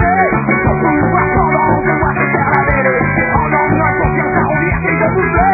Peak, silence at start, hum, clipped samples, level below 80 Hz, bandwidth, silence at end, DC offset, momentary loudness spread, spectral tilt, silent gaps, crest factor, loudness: 0 dBFS; 0 s; none; under 0.1%; -26 dBFS; 2.7 kHz; 0 s; under 0.1%; 2 LU; -13 dB/octave; none; 12 dB; -12 LUFS